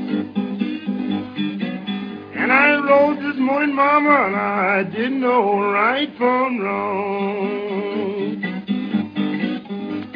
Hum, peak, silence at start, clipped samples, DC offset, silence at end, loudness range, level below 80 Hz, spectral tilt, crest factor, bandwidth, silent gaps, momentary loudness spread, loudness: none; 0 dBFS; 0 s; under 0.1%; under 0.1%; 0 s; 6 LU; -68 dBFS; -8.5 dB/octave; 18 dB; 5.2 kHz; none; 11 LU; -19 LUFS